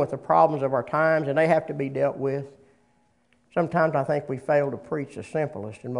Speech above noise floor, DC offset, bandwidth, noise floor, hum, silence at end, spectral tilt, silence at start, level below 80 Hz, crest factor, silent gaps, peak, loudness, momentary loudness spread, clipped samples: 41 dB; under 0.1%; 11 kHz; -66 dBFS; none; 0 s; -8 dB/octave; 0 s; -66 dBFS; 18 dB; none; -6 dBFS; -24 LUFS; 11 LU; under 0.1%